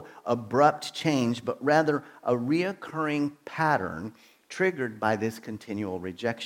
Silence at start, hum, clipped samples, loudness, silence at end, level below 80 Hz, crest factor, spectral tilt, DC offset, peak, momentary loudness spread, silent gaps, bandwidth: 0 s; none; under 0.1%; -28 LUFS; 0 s; -68 dBFS; 20 dB; -6 dB/octave; under 0.1%; -8 dBFS; 11 LU; none; 16.5 kHz